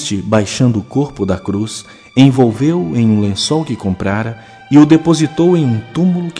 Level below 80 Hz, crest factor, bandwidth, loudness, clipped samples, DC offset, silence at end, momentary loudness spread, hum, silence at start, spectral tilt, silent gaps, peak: -46 dBFS; 12 dB; 10.5 kHz; -13 LUFS; 0.7%; under 0.1%; 0 s; 10 LU; none; 0 s; -6.5 dB/octave; none; 0 dBFS